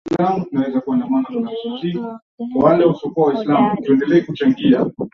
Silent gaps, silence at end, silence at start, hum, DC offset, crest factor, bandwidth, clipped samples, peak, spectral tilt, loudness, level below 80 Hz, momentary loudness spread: 2.22-2.38 s; 0.05 s; 0.05 s; none; under 0.1%; 14 dB; 6.2 kHz; under 0.1%; -2 dBFS; -8.5 dB/octave; -17 LUFS; -56 dBFS; 10 LU